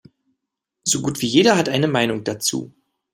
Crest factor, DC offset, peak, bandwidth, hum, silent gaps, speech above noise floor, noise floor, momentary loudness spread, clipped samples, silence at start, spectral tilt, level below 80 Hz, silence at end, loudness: 20 dB; under 0.1%; -2 dBFS; 16 kHz; none; none; 61 dB; -80 dBFS; 8 LU; under 0.1%; 0.85 s; -3.5 dB/octave; -60 dBFS; 0.45 s; -19 LUFS